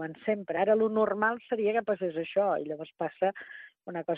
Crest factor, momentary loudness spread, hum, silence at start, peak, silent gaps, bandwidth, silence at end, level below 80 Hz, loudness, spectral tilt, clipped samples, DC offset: 16 dB; 14 LU; none; 0 s; -12 dBFS; none; 4.1 kHz; 0 s; -76 dBFS; -29 LUFS; -9 dB/octave; under 0.1%; under 0.1%